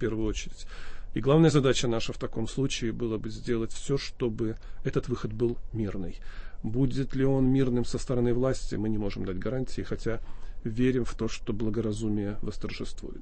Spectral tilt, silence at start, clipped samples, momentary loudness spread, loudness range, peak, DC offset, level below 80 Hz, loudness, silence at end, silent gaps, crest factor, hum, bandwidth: -6.5 dB/octave; 0 s; under 0.1%; 14 LU; 4 LU; -10 dBFS; under 0.1%; -38 dBFS; -30 LUFS; 0 s; none; 18 dB; none; 8.8 kHz